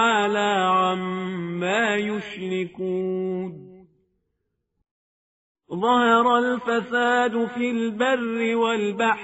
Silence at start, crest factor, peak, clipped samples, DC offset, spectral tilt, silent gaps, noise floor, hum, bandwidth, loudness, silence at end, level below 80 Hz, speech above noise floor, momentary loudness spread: 0 s; 18 dB; -6 dBFS; under 0.1%; under 0.1%; -3 dB/octave; 4.91-5.55 s; -77 dBFS; none; 8 kHz; -22 LUFS; 0 s; -68 dBFS; 54 dB; 10 LU